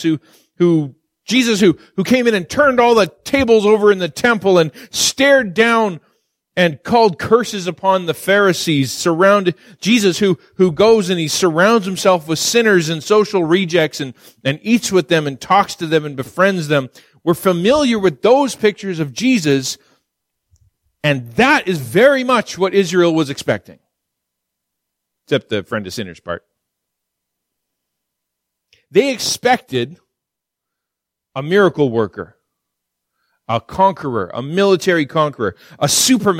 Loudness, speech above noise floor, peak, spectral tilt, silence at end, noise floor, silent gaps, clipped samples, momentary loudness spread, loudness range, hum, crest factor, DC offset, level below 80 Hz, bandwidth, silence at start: -15 LUFS; 67 dB; 0 dBFS; -4.5 dB/octave; 0 s; -81 dBFS; none; under 0.1%; 11 LU; 9 LU; none; 16 dB; under 0.1%; -52 dBFS; 16.5 kHz; 0 s